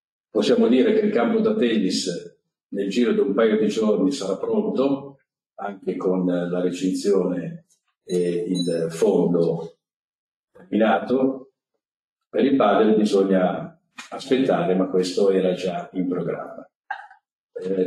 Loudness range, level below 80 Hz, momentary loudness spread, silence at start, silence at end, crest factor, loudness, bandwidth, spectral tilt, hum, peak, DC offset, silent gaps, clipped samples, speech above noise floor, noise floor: 4 LU; -68 dBFS; 16 LU; 0.35 s; 0 s; 16 dB; -21 LUFS; 12.5 kHz; -6 dB/octave; none; -6 dBFS; under 0.1%; 2.63-2.69 s, 5.46-5.50 s, 9.94-10.48 s, 11.96-12.16 s, 16.75-16.83 s, 17.32-17.49 s; under 0.1%; 50 dB; -71 dBFS